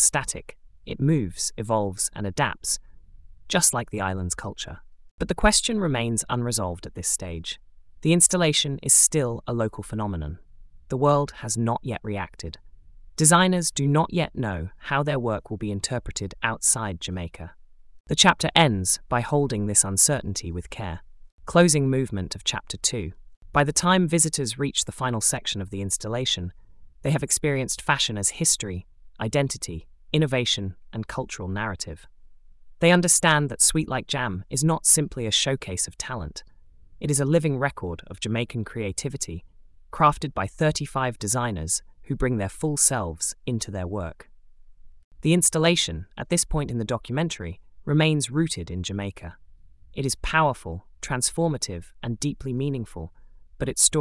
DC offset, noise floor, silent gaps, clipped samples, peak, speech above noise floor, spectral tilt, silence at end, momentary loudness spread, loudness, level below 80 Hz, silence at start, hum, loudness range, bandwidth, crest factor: under 0.1%; -48 dBFS; 5.11-5.18 s, 18.00-18.04 s, 21.32-21.38 s, 23.37-23.41 s, 45.04-45.11 s; under 0.1%; -2 dBFS; 24 dB; -3.5 dB/octave; 0 s; 16 LU; -23 LUFS; -44 dBFS; 0 s; none; 6 LU; 12 kHz; 22 dB